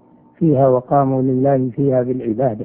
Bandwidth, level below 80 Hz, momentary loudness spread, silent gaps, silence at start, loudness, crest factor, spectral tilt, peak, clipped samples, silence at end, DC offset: 3.2 kHz; -52 dBFS; 5 LU; none; 0.4 s; -16 LUFS; 14 dB; -14.5 dB/octave; -2 dBFS; under 0.1%; 0 s; under 0.1%